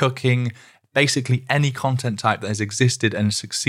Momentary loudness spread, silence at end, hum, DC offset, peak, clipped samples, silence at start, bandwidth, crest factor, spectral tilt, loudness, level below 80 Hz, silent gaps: 5 LU; 0 s; none; under 0.1%; -2 dBFS; under 0.1%; 0 s; 14.5 kHz; 20 dB; -4.5 dB/octave; -21 LUFS; -64 dBFS; none